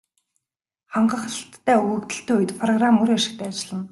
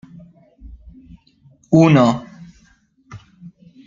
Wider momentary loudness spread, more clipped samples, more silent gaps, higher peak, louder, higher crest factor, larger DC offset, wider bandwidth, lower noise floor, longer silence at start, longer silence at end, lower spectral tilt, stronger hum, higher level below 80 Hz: second, 11 LU vs 28 LU; neither; neither; second, -6 dBFS vs -2 dBFS; second, -22 LUFS vs -14 LUFS; about the same, 16 dB vs 18 dB; neither; first, 12 kHz vs 7.4 kHz; first, -86 dBFS vs -56 dBFS; first, 0.9 s vs 0.65 s; second, 0.05 s vs 0.4 s; second, -4.5 dB/octave vs -7.5 dB/octave; neither; second, -66 dBFS vs -48 dBFS